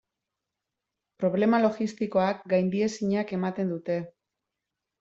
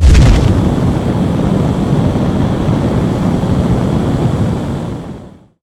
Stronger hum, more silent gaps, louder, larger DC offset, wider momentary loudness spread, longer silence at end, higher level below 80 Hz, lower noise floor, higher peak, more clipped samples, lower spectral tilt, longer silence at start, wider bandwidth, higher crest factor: neither; neither; second, -27 LUFS vs -13 LUFS; neither; about the same, 8 LU vs 9 LU; first, 0.9 s vs 0.35 s; second, -70 dBFS vs -18 dBFS; first, -86 dBFS vs -33 dBFS; second, -10 dBFS vs 0 dBFS; neither; about the same, -7 dB/octave vs -7.5 dB/octave; first, 1.2 s vs 0 s; second, 8 kHz vs 12.5 kHz; first, 18 dB vs 12 dB